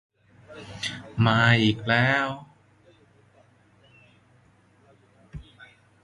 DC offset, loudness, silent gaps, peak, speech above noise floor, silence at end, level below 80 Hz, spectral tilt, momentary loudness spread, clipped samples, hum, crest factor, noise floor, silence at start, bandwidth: under 0.1%; -23 LUFS; none; -4 dBFS; 38 dB; 0.6 s; -56 dBFS; -6 dB/octave; 26 LU; under 0.1%; none; 24 dB; -59 dBFS; 0.5 s; 11.5 kHz